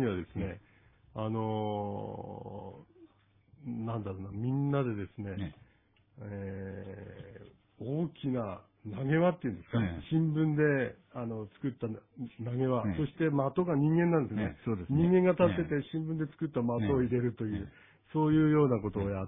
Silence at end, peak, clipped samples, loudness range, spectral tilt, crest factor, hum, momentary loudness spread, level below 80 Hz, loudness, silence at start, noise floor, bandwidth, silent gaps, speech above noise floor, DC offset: 0 s; -12 dBFS; under 0.1%; 10 LU; -11.5 dB/octave; 20 dB; none; 18 LU; -58 dBFS; -32 LUFS; 0 s; -68 dBFS; 3.8 kHz; none; 36 dB; under 0.1%